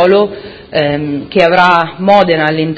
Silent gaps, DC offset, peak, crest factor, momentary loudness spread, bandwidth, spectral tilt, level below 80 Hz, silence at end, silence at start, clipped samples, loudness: none; under 0.1%; 0 dBFS; 10 dB; 10 LU; 8 kHz; -7 dB/octave; -44 dBFS; 0 s; 0 s; 0.7%; -11 LUFS